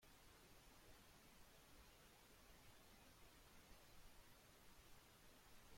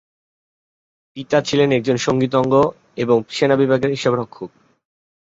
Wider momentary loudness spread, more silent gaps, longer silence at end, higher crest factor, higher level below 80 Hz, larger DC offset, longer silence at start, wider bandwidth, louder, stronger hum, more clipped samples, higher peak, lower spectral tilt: second, 1 LU vs 17 LU; neither; second, 0 s vs 0.75 s; about the same, 14 dB vs 18 dB; second, -74 dBFS vs -54 dBFS; neither; second, 0 s vs 1.15 s; first, 16.5 kHz vs 8 kHz; second, -68 LUFS vs -18 LUFS; neither; neither; second, -52 dBFS vs -2 dBFS; second, -3 dB/octave vs -6 dB/octave